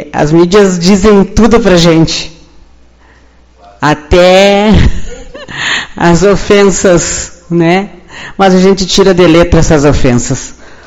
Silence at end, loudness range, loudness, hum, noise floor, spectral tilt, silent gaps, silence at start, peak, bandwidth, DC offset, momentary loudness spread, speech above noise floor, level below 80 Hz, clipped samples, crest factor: 0.1 s; 2 LU; -7 LUFS; none; -41 dBFS; -5 dB/octave; none; 0 s; 0 dBFS; 11.5 kHz; under 0.1%; 13 LU; 35 dB; -20 dBFS; 4%; 8 dB